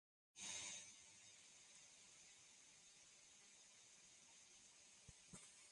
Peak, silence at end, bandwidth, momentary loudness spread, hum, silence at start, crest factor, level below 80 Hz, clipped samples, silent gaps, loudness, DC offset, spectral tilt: -40 dBFS; 0 s; 11.5 kHz; 13 LU; none; 0.35 s; 24 dB; -86 dBFS; under 0.1%; none; -60 LUFS; under 0.1%; 0 dB/octave